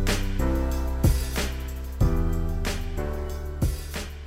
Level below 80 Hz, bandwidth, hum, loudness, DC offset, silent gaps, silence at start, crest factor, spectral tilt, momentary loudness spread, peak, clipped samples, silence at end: -28 dBFS; 16 kHz; none; -28 LUFS; 0.3%; none; 0 s; 14 dB; -5.5 dB/octave; 9 LU; -10 dBFS; under 0.1%; 0 s